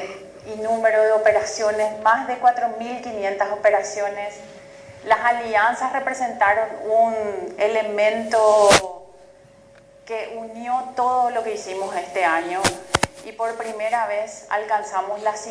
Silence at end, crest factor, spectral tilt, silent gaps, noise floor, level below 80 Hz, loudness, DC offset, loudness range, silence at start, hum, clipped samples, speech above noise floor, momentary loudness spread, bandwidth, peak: 0 s; 18 dB; -2.5 dB/octave; none; -49 dBFS; -56 dBFS; -21 LUFS; under 0.1%; 5 LU; 0 s; none; under 0.1%; 29 dB; 13 LU; 11 kHz; -4 dBFS